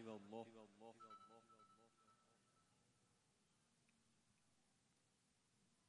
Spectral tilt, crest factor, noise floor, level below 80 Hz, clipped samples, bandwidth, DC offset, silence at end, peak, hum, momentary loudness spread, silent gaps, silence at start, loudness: -5.5 dB/octave; 24 dB; -83 dBFS; under -90 dBFS; under 0.1%; 10 kHz; under 0.1%; 0 s; -42 dBFS; none; 11 LU; none; 0 s; -61 LUFS